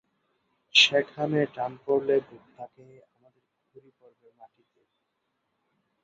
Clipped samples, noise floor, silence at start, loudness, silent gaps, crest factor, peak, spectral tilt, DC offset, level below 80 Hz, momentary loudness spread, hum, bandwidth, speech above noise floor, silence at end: under 0.1%; -79 dBFS; 0.75 s; -24 LUFS; none; 26 dB; -4 dBFS; -3 dB/octave; under 0.1%; -74 dBFS; 27 LU; none; 7.8 kHz; 51 dB; 3.4 s